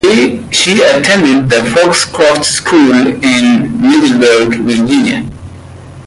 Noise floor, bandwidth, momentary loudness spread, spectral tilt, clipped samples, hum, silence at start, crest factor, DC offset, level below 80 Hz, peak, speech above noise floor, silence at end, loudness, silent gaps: -29 dBFS; 11.5 kHz; 4 LU; -4 dB/octave; under 0.1%; none; 0.05 s; 8 dB; under 0.1%; -40 dBFS; 0 dBFS; 21 dB; 0.05 s; -8 LUFS; none